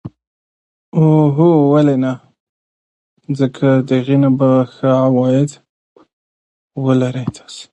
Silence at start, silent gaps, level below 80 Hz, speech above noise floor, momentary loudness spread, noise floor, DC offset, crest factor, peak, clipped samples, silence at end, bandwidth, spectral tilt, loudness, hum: 0.05 s; 0.27-0.92 s, 2.40-3.17 s, 5.69-5.96 s, 6.13-6.70 s; -56 dBFS; over 77 dB; 13 LU; under -90 dBFS; under 0.1%; 14 dB; 0 dBFS; under 0.1%; 0.1 s; 9 kHz; -8.5 dB/octave; -14 LUFS; none